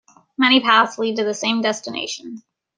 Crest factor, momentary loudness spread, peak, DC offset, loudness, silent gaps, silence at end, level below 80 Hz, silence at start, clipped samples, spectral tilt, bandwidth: 18 dB; 17 LU; -2 dBFS; under 0.1%; -18 LUFS; none; 0.4 s; -70 dBFS; 0.4 s; under 0.1%; -2.5 dB/octave; 10 kHz